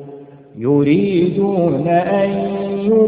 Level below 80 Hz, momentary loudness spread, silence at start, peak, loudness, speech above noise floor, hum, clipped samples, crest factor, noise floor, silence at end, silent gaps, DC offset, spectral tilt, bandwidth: -52 dBFS; 7 LU; 0 s; -2 dBFS; -16 LUFS; 22 dB; none; under 0.1%; 14 dB; -37 dBFS; 0 s; none; under 0.1%; -13 dB/octave; 4.8 kHz